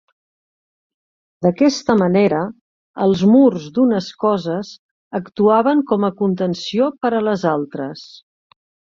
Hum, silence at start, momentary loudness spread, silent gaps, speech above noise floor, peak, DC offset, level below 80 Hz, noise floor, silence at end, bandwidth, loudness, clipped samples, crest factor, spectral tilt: none; 1.4 s; 15 LU; 2.61-2.94 s, 4.79-5.11 s; over 74 dB; -2 dBFS; under 0.1%; -58 dBFS; under -90 dBFS; 0.9 s; 7.4 kHz; -17 LUFS; under 0.1%; 16 dB; -7 dB/octave